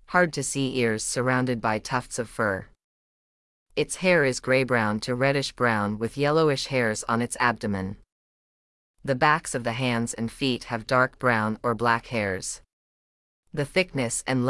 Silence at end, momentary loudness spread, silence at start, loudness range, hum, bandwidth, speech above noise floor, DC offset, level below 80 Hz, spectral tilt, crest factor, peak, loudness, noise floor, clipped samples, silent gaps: 0 s; 8 LU; 0.1 s; 4 LU; none; 12 kHz; over 65 dB; under 0.1%; -54 dBFS; -4.5 dB/octave; 20 dB; -6 dBFS; -25 LUFS; under -90 dBFS; under 0.1%; 2.84-3.66 s, 8.12-8.94 s, 12.73-13.43 s